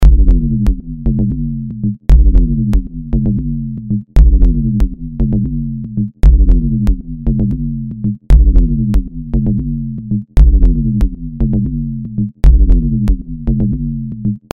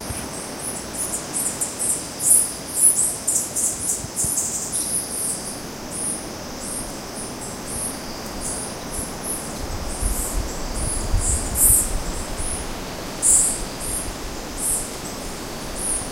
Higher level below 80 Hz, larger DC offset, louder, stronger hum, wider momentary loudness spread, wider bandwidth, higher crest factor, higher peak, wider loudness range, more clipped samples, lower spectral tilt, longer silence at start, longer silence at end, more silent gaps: first, -12 dBFS vs -34 dBFS; neither; first, -15 LUFS vs -22 LUFS; neither; second, 9 LU vs 16 LU; second, 2.7 kHz vs 16 kHz; second, 12 dB vs 22 dB; about the same, 0 dBFS vs -2 dBFS; second, 2 LU vs 10 LU; neither; first, -10 dB/octave vs -2 dB/octave; about the same, 0 s vs 0 s; first, 0.15 s vs 0 s; neither